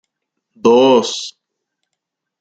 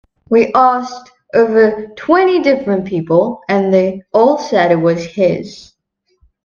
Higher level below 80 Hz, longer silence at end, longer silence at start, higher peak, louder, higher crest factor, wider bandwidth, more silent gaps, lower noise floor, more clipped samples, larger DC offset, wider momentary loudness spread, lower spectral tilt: second, -64 dBFS vs -54 dBFS; first, 1.1 s vs 0.85 s; first, 0.65 s vs 0.3 s; about the same, -2 dBFS vs 0 dBFS; about the same, -13 LUFS vs -13 LUFS; about the same, 16 dB vs 14 dB; first, 9 kHz vs 7.2 kHz; neither; first, -78 dBFS vs -65 dBFS; neither; neither; first, 15 LU vs 8 LU; second, -4 dB/octave vs -7 dB/octave